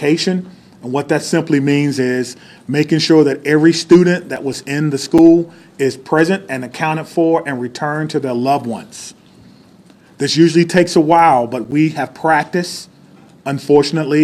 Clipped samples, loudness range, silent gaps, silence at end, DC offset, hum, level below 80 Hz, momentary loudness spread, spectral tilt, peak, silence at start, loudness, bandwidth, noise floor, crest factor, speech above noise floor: under 0.1%; 6 LU; none; 0 s; under 0.1%; none; -56 dBFS; 14 LU; -5.5 dB/octave; 0 dBFS; 0 s; -14 LUFS; 13.5 kHz; -45 dBFS; 14 dB; 31 dB